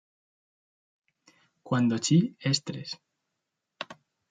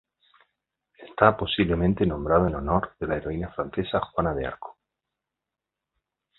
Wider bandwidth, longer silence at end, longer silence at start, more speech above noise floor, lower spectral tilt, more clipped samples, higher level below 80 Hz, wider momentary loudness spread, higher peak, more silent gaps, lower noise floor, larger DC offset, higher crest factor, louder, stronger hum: first, 9.6 kHz vs 4.2 kHz; second, 0.4 s vs 1.65 s; first, 1.65 s vs 1 s; second, 57 dB vs 62 dB; second, -5 dB/octave vs -11 dB/octave; neither; second, -72 dBFS vs -42 dBFS; first, 18 LU vs 11 LU; second, -10 dBFS vs -2 dBFS; neither; about the same, -84 dBFS vs -87 dBFS; neither; second, 20 dB vs 26 dB; about the same, -27 LUFS vs -25 LUFS; neither